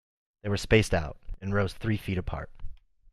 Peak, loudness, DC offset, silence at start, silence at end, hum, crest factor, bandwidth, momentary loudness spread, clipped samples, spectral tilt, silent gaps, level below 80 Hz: -8 dBFS; -29 LUFS; under 0.1%; 0.45 s; 0.35 s; none; 22 dB; 13 kHz; 16 LU; under 0.1%; -6 dB/octave; none; -40 dBFS